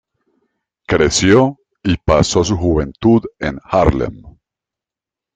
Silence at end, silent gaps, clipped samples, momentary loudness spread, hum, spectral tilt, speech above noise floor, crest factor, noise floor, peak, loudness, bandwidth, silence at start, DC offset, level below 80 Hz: 1.05 s; none; under 0.1%; 11 LU; none; -5 dB/octave; 73 dB; 16 dB; -87 dBFS; 0 dBFS; -15 LUFS; 9.4 kHz; 0.9 s; under 0.1%; -32 dBFS